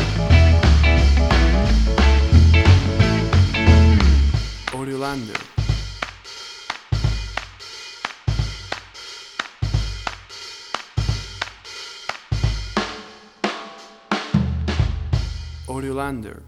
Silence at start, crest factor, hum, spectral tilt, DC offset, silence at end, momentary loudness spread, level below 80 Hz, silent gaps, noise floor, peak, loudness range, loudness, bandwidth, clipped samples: 0 s; 18 dB; none; -6 dB/octave; under 0.1%; 0.05 s; 19 LU; -22 dBFS; none; -40 dBFS; 0 dBFS; 12 LU; -19 LUFS; 10.5 kHz; under 0.1%